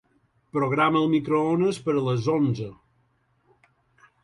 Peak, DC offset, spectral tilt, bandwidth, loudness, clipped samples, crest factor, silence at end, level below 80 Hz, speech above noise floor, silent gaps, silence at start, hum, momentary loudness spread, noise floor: -8 dBFS; under 0.1%; -7.5 dB/octave; 11.5 kHz; -24 LUFS; under 0.1%; 18 dB; 1.5 s; -62 dBFS; 44 dB; none; 0.55 s; none; 9 LU; -67 dBFS